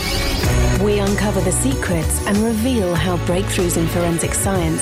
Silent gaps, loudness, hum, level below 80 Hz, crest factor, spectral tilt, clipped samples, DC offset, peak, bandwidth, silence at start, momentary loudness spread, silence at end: none; -18 LUFS; none; -26 dBFS; 10 dB; -5 dB/octave; under 0.1%; under 0.1%; -8 dBFS; 16.5 kHz; 0 s; 2 LU; 0 s